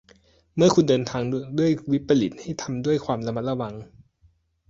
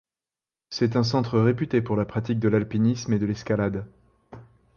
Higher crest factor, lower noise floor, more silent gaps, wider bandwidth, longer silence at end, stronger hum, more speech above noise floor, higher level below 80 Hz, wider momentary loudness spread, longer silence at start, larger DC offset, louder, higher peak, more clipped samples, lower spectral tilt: about the same, 18 dB vs 16 dB; second, -62 dBFS vs under -90 dBFS; neither; first, 7.8 kHz vs 7 kHz; first, 0.85 s vs 0.35 s; neither; second, 39 dB vs over 67 dB; about the same, -56 dBFS vs -52 dBFS; first, 12 LU vs 6 LU; second, 0.55 s vs 0.7 s; neither; about the same, -24 LUFS vs -24 LUFS; about the same, -6 dBFS vs -8 dBFS; neither; about the same, -6.5 dB/octave vs -7 dB/octave